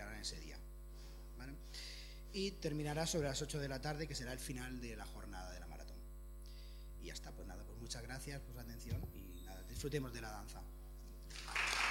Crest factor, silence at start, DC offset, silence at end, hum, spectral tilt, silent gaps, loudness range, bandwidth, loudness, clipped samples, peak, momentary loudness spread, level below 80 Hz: 24 dB; 0 s; under 0.1%; 0 s; none; -4 dB/octave; none; 8 LU; 17 kHz; -46 LUFS; under 0.1%; -22 dBFS; 16 LU; -52 dBFS